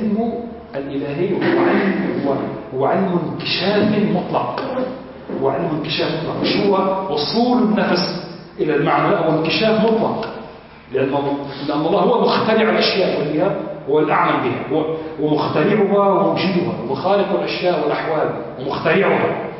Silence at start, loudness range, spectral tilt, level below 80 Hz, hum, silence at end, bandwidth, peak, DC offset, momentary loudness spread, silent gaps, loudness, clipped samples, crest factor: 0 s; 2 LU; -9 dB/octave; -52 dBFS; none; 0 s; 6 kHz; -4 dBFS; under 0.1%; 9 LU; none; -18 LUFS; under 0.1%; 14 dB